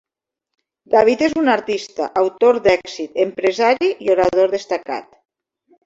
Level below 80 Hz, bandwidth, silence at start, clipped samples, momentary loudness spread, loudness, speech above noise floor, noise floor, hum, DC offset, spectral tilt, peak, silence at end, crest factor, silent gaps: -54 dBFS; 7.8 kHz; 0.9 s; under 0.1%; 9 LU; -17 LUFS; 66 dB; -82 dBFS; none; under 0.1%; -4.5 dB/octave; -2 dBFS; 0.85 s; 16 dB; none